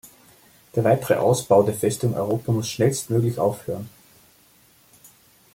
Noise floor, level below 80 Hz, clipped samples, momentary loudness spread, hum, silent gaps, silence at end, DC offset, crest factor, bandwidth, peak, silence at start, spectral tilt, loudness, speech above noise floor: -56 dBFS; -60 dBFS; under 0.1%; 12 LU; none; none; 1.65 s; under 0.1%; 18 dB; 17 kHz; -4 dBFS; 0.05 s; -6 dB/octave; -22 LUFS; 35 dB